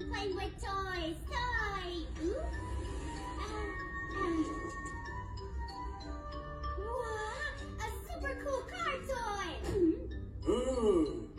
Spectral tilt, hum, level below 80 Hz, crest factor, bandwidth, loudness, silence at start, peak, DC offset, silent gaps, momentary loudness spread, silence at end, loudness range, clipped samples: -5.5 dB/octave; none; -44 dBFS; 18 dB; 15.5 kHz; -38 LUFS; 0 s; -18 dBFS; under 0.1%; none; 11 LU; 0 s; 5 LU; under 0.1%